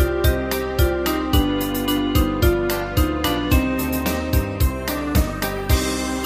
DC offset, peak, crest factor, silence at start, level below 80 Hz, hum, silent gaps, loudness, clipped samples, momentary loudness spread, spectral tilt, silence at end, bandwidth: under 0.1%; -4 dBFS; 16 dB; 0 s; -24 dBFS; none; none; -21 LUFS; under 0.1%; 3 LU; -5.5 dB/octave; 0 s; 15.5 kHz